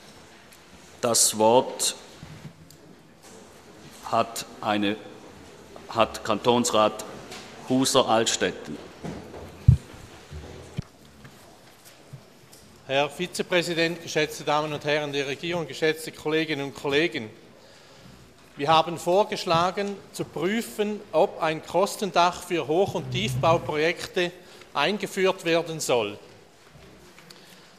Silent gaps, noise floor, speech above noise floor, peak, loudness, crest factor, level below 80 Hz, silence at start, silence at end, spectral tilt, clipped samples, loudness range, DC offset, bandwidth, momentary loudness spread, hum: none; -51 dBFS; 27 dB; -2 dBFS; -25 LUFS; 24 dB; -48 dBFS; 0.05 s; 0.9 s; -4 dB/octave; under 0.1%; 6 LU; under 0.1%; 15 kHz; 20 LU; none